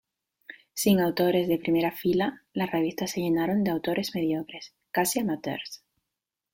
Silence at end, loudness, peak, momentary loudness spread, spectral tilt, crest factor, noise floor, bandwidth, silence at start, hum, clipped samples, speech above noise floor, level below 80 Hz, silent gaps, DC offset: 0.8 s; -27 LUFS; -10 dBFS; 16 LU; -5 dB/octave; 18 dB; -86 dBFS; 17 kHz; 0.5 s; none; under 0.1%; 60 dB; -64 dBFS; none; under 0.1%